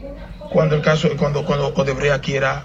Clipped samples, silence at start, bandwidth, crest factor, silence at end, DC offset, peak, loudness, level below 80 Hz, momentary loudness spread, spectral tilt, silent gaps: under 0.1%; 0 s; 8 kHz; 16 dB; 0 s; under 0.1%; -4 dBFS; -18 LUFS; -38 dBFS; 5 LU; -6 dB/octave; none